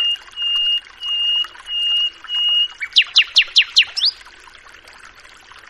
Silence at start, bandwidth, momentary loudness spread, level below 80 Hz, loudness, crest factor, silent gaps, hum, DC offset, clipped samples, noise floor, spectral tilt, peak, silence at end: 0 s; 12.5 kHz; 8 LU; -58 dBFS; -15 LUFS; 20 dB; none; none; under 0.1%; under 0.1%; -43 dBFS; 3.5 dB/octave; 0 dBFS; 0.1 s